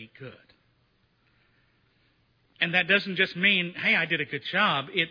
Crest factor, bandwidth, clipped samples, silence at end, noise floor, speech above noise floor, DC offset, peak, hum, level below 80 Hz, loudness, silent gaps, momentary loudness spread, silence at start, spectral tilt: 22 dB; 5.4 kHz; under 0.1%; 0 s; -68 dBFS; 42 dB; under 0.1%; -8 dBFS; none; -74 dBFS; -24 LUFS; none; 12 LU; 0 s; -6 dB/octave